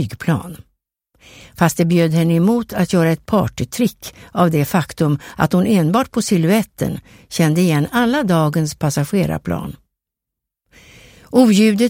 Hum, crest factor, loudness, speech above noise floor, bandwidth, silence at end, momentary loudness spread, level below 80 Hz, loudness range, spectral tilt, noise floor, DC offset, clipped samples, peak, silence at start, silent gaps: none; 16 dB; -17 LUFS; 66 dB; 16.5 kHz; 0 s; 9 LU; -46 dBFS; 3 LU; -6 dB/octave; -82 dBFS; under 0.1%; under 0.1%; 0 dBFS; 0 s; none